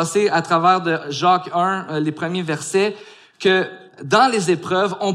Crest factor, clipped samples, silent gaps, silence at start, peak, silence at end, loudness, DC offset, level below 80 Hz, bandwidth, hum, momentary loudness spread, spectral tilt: 16 dB; under 0.1%; none; 0 s; -2 dBFS; 0 s; -18 LUFS; under 0.1%; -70 dBFS; 13.5 kHz; none; 8 LU; -4.5 dB/octave